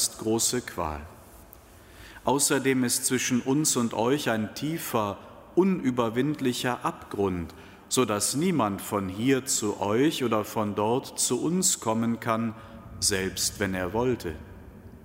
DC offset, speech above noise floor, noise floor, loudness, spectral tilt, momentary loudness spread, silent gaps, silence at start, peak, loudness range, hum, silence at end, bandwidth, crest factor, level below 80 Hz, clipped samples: under 0.1%; 24 dB; -50 dBFS; -26 LUFS; -3.5 dB/octave; 9 LU; none; 0 s; -10 dBFS; 2 LU; none; 0.05 s; 16 kHz; 18 dB; -54 dBFS; under 0.1%